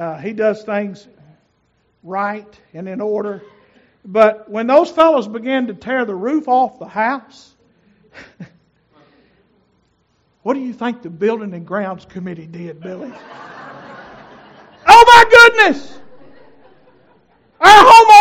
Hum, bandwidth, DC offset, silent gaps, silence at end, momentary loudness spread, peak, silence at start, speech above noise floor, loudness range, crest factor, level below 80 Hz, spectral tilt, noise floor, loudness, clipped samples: none; over 20 kHz; under 0.1%; none; 0 s; 26 LU; 0 dBFS; 0 s; 49 dB; 18 LU; 14 dB; -48 dBFS; -3 dB/octave; -62 dBFS; -11 LUFS; 2%